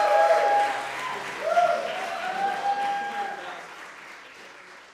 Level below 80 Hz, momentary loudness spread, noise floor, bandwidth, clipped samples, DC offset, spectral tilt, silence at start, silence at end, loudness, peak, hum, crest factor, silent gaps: -70 dBFS; 23 LU; -46 dBFS; 15 kHz; under 0.1%; under 0.1%; -2 dB/octave; 0 s; 0 s; -25 LUFS; -8 dBFS; none; 18 dB; none